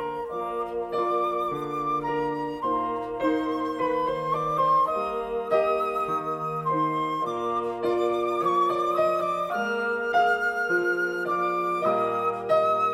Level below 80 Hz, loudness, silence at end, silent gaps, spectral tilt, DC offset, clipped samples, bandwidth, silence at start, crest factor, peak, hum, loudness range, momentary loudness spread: -58 dBFS; -26 LUFS; 0 s; none; -6 dB/octave; under 0.1%; under 0.1%; 15.5 kHz; 0 s; 14 dB; -10 dBFS; none; 3 LU; 6 LU